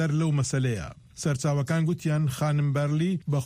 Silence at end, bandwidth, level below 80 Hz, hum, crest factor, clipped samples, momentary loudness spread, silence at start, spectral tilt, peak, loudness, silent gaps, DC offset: 0 s; 15 kHz; -54 dBFS; none; 10 dB; under 0.1%; 5 LU; 0 s; -6.5 dB/octave; -16 dBFS; -26 LUFS; none; under 0.1%